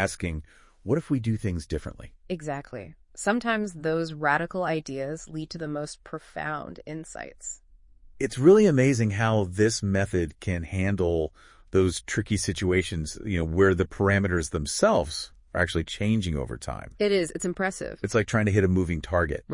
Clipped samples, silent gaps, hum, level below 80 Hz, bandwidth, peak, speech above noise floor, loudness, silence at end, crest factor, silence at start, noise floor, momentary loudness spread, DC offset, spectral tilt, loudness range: under 0.1%; none; none; -46 dBFS; 11 kHz; -6 dBFS; 27 dB; -26 LUFS; 0 s; 20 dB; 0 s; -52 dBFS; 14 LU; under 0.1%; -5.5 dB/octave; 7 LU